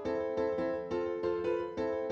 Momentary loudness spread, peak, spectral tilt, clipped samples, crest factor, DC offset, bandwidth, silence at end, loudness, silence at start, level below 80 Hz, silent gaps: 2 LU; -22 dBFS; -7 dB/octave; under 0.1%; 12 dB; under 0.1%; 7.4 kHz; 0 s; -34 LUFS; 0 s; -60 dBFS; none